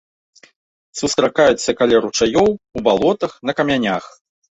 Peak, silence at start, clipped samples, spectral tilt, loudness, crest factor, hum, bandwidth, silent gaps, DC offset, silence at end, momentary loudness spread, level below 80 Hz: -2 dBFS; 0.95 s; under 0.1%; -4 dB/octave; -17 LUFS; 16 dB; none; 8.2 kHz; none; under 0.1%; 0.55 s; 7 LU; -48 dBFS